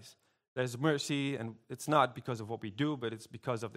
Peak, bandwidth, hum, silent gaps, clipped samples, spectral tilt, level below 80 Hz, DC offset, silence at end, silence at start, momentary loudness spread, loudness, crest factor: -12 dBFS; 16 kHz; none; 0.48-0.56 s; under 0.1%; -5.5 dB/octave; -76 dBFS; under 0.1%; 0 s; 0 s; 13 LU; -35 LUFS; 22 dB